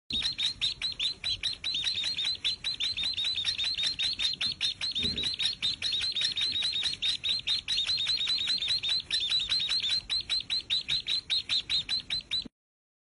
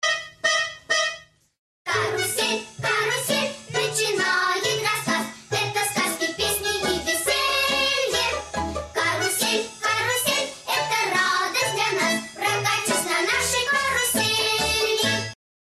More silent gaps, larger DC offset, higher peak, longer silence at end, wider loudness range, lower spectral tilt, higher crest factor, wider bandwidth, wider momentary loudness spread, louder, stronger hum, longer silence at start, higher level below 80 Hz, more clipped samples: second, none vs 1.58-1.85 s; neither; second, -16 dBFS vs -8 dBFS; first, 0.75 s vs 0.35 s; about the same, 2 LU vs 2 LU; second, 0 dB/octave vs -1.5 dB/octave; about the same, 16 dB vs 16 dB; second, 11 kHz vs 16 kHz; about the same, 3 LU vs 5 LU; second, -28 LUFS vs -22 LUFS; neither; about the same, 0.1 s vs 0 s; second, -58 dBFS vs -52 dBFS; neither